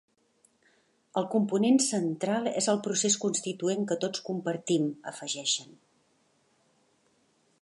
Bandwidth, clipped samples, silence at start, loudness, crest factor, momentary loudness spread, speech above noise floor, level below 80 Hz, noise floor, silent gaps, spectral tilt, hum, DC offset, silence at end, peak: 11.5 kHz; under 0.1%; 1.15 s; -29 LUFS; 18 dB; 9 LU; 41 dB; -80 dBFS; -69 dBFS; none; -3.5 dB/octave; none; under 0.1%; 2 s; -12 dBFS